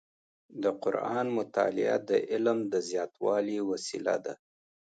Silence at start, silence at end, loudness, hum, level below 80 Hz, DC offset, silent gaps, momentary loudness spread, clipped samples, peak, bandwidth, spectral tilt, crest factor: 0.5 s; 0.55 s; -30 LUFS; none; -80 dBFS; under 0.1%; none; 6 LU; under 0.1%; -14 dBFS; 9.2 kHz; -5 dB/octave; 18 dB